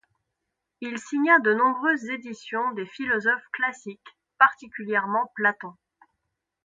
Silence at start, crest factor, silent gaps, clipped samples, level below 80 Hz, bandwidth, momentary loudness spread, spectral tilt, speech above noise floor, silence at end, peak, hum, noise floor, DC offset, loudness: 0.8 s; 24 dB; none; under 0.1%; -72 dBFS; 9.2 kHz; 18 LU; -4.5 dB/octave; 57 dB; 0.95 s; -2 dBFS; none; -82 dBFS; under 0.1%; -24 LUFS